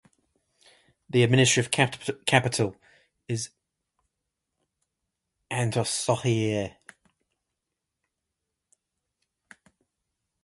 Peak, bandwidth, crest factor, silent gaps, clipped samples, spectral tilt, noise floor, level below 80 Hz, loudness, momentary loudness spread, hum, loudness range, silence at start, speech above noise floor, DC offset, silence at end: -4 dBFS; 11.5 kHz; 26 dB; none; under 0.1%; -4 dB/octave; -85 dBFS; -62 dBFS; -25 LUFS; 13 LU; none; 10 LU; 1.15 s; 60 dB; under 0.1%; 3.75 s